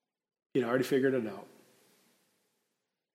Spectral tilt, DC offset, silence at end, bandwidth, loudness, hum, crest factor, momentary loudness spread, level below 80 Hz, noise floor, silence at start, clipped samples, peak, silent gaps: -6 dB/octave; under 0.1%; 1.7 s; 16 kHz; -31 LUFS; none; 20 dB; 13 LU; -86 dBFS; -85 dBFS; 0.55 s; under 0.1%; -16 dBFS; none